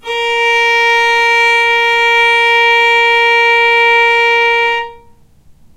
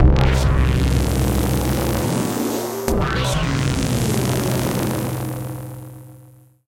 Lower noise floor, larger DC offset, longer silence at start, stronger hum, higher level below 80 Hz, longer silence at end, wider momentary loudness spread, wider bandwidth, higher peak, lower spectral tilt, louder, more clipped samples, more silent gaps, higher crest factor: second, -43 dBFS vs -47 dBFS; neither; about the same, 0.05 s vs 0 s; neither; second, -50 dBFS vs -24 dBFS; first, 0.8 s vs 0.45 s; second, 4 LU vs 11 LU; about the same, 16 kHz vs 17 kHz; about the same, -2 dBFS vs 0 dBFS; second, 0.5 dB/octave vs -5.5 dB/octave; first, -8 LUFS vs -20 LUFS; neither; neither; second, 10 dB vs 18 dB